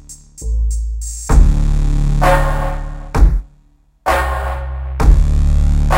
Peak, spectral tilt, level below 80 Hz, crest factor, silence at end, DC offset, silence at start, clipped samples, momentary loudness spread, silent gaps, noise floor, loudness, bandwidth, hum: 0 dBFS; -6 dB/octave; -14 dBFS; 14 dB; 0 s; under 0.1%; 0.1 s; 0.1%; 11 LU; none; -51 dBFS; -17 LUFS; 15.5 kHz; none